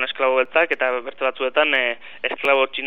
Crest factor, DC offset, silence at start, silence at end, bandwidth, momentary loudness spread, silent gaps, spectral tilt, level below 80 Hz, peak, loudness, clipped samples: 18 dB; 0.9%; 0 s; 0 s; 6.2 kHz; 7 LU; none; -3.5 dB/octave; -72 dBFS; -4 dBFS; -20 LUFS; under 0.1%